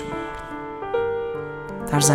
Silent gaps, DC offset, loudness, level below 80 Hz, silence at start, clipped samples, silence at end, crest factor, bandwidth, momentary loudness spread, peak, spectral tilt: none; under 0.1%; -27 LUFS; -46 dBFS; 0 s; under 0.1%; 0 s; 20 dB; 16.5 kHz; 9 LU; -4 dBFS; -4 dB/octave